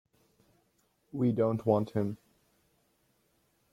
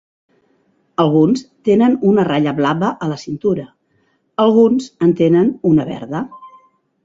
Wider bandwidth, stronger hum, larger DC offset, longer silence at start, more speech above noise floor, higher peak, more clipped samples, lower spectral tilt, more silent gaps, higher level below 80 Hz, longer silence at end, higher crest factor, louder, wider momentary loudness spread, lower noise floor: first, 14.5 kHz vs 7.6 kHz; neither; neither; first, 1.15 s vs 1 s; about the same, 44 dB vs 47 dB; second, -12 dBFS vs -2 dBFS; neither; first, -10 dB/octave vs -7.5 dB/octave; neither; second, -70 dBFS vs -56 dBFS; first, 1.6 s vs 0.55 s; first, 22 dB vs 14 dB; second, -30 LUFS vs -15 LUFS; first, 14 LU vs 11 LU; first, -73 dBFS vs -61 dBFS